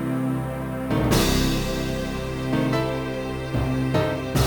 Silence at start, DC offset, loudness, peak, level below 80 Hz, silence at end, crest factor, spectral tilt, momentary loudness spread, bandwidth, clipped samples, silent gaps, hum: 0 s; under 0.1%; -24 LUFS; -6 dBFS; -34 dBFS; 0 s; 18 dB; -5.5 dB/octave; 8 LU; over 20 kHz; under 0.1%; none; none